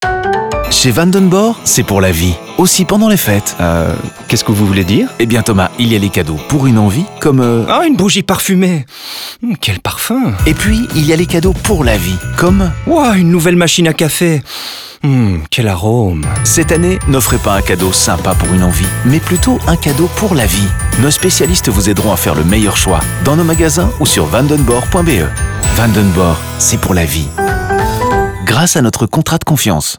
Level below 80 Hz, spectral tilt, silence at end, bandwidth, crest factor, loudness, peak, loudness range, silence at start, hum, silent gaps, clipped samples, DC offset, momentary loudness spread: -24 dBFS; -4.5 dB/octave; 0 s; over 20 kHz; 10 dB; -11 LUFS; 0 dBFS; 2 LU; 0 s; none; none; under 0.1%; 0.4%; 5 LU